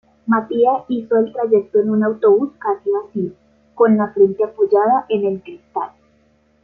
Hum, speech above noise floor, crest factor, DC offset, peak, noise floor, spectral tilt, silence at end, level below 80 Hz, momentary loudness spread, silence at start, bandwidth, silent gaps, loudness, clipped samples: none; 41 dB; 16 dB; under 0.1%; -2 dBFS; -57 dBFS; -10 dB/octave; 0.75 s; -62 dBFS; 12 LU; 0.25 s; 4 kHz; none; -17 LUFS; under 0.1%